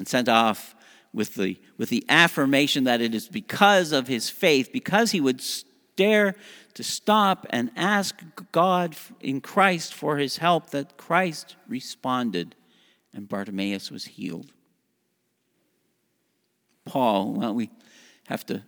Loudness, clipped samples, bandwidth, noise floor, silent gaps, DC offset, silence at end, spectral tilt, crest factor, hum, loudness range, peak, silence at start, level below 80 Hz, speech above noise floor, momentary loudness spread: -23 LUFS; under 0.1%; over 20 kHz; -73 dBFS; none; under 0.1%; 0.05 s; -4 dB/octave; 24 dB; none; 14 LU; 0 dBFS; 0 s; -76 dBFS; 49 dB; 15 LU